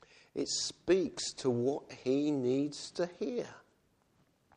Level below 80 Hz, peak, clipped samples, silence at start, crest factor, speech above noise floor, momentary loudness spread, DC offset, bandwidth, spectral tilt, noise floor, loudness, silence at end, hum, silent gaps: -70 dBFS; -18 dBFS; under 0.1%; 0.35 s; 18 dB; 38 dB; 8 LU; under 0.1%; 10.5 kHz; -4.5 dB/octave; -72 dBFS; -34 LUFS; 0.95 s; none; none